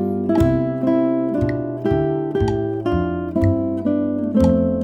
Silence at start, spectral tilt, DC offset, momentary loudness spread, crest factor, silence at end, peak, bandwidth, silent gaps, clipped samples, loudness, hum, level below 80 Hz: 0 s; -9.5 dB/octave; under 0.1%; 5 LU; 14 dB; 0 s; -4 dBFS; 10 kHz; none; under 0.1%; -19 LUFS; none; -36 dBFS